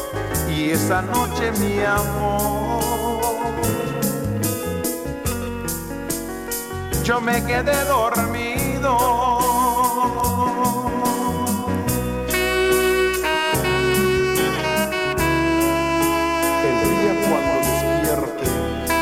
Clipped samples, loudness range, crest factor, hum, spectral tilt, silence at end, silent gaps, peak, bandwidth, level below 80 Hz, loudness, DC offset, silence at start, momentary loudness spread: under 0.1%; 5 LU; 14 dB; none; -4.5 dB/octave; 0 s; none; -6 dBFS; 16.5 kHz; -36 dBFS; -20 LUFS; under 0.1%; 0 s; 7 LU